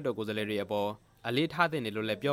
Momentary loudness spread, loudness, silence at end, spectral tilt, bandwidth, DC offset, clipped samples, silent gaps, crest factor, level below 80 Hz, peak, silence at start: 6 LU; -32 LUFS; 0 s; -6 dB/octave; 16.5 kHz; under 0.1%; under 0.1%; none; 22 dB; -68 dBFS; -10 dBFS; 0 s